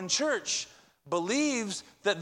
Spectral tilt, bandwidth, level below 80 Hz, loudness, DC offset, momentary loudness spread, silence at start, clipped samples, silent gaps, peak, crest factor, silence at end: -2 dB/octave; 12.5 kHz; -74 dBFS; -30 LUFS; under 0.1%; 7 LU; 0 s; under 0.1%; none; -14 dBFS; 18 dB; 0 s